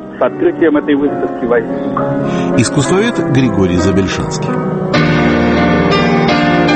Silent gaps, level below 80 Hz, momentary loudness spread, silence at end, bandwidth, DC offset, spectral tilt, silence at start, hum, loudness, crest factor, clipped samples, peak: none; -34 dBFS; 6 LU; 0 s; 8.8 kHz; under 0.1%; -6 dB/octave; 0 s; none; -12 LUFS; 12 dB; under 0.1%; 0 dBFS